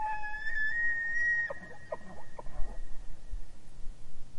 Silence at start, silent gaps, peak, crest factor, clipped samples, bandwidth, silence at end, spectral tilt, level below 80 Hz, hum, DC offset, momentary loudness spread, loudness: 0 s; none; -16 dBFS; 14 dB; under 0.1%; 7.6 kHz; 0 s; -4 dB/octave; -42 dBFS; none; under 0.1%; 24 LU; -32 LUFS